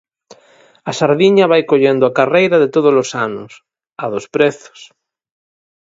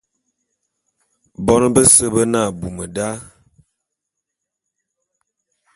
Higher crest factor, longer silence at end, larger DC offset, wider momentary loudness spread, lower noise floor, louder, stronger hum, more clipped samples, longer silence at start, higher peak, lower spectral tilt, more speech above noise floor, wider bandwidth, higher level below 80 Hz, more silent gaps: about the same, 16 dB vs 20 dB; second, 1.05 s vs 2.5 s; neither; second, 14 LU vs 17 LU; second, -49 dBFS vs -80 dBFS; about the same, -13 LUFS vs -14 LUFS; neither; neither; second, 0.85 s vs 1.4 s; about the same, 0 dBFS vs 0 dBFS; first, -5.5 dB/octave vs -4 dB/octave; second, 36 dB vs 64 dB; second, 7.8 kHz vs 16 kHz; second, -62 dBFS vs -44 dBFS; neither